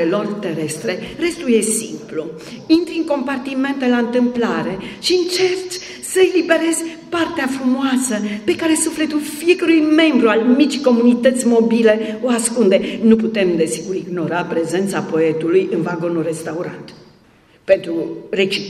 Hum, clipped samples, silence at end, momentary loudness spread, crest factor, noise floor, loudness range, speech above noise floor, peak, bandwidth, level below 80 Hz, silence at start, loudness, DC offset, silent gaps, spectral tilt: none; under 0.1%; 0 s; 10 LU; 16 dB; -50 dBFS; 6 LU; 34 dB; 0 dBFS; 14.5 kHz; -56 dBFS; 0 s; -17 LUFS; under 0.1%; none; -4 dB/octave